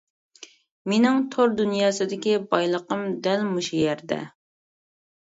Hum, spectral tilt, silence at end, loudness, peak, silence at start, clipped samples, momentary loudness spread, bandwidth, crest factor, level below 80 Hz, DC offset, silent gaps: none; -5 dB/octave; 1 s; -23 LUFS; -4 dBFS; 0.4 s; under 0.1%; 9 LU; 8 kHz; 20 dB; -68 dBFS; under 0.1%; 0.71-0.85 s